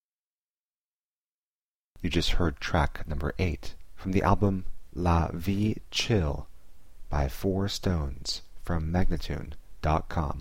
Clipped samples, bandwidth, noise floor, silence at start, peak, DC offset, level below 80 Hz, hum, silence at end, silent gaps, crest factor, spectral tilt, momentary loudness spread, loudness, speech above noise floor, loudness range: under 0.1%; 16.5 kHz; under -90 dBFS; 0 s; -10 dBFS; 0.8%; -36 dBFS; none; 0 s; 0.00-1.95 s; 20 dB; -6 dB/octave; 11 LU; -30 LUFS; over 63 dB; 3 LU